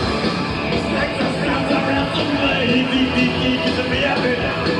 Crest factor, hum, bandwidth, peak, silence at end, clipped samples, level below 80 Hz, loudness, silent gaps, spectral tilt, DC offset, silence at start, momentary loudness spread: 12 dB; none; 11 kHz; -6 dBFS; 0 s; under 0.1%; -38 dBFS; -18 LUFS; none; -5.5 dB/octave; under 0.1%; 0 s; 3 LU